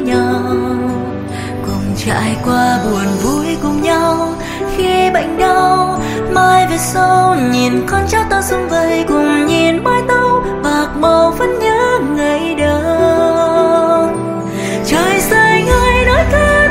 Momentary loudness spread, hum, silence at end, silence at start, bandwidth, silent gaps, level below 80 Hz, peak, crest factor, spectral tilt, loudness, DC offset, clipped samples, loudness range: 8 LU; none; 0 s; 0 s; 16 kHz; none; -28 dBFS; 0 dBFS; 12 dB; -5 dB/octave; -13 LUFS; under 0.1%; under 0.1%; 3 LU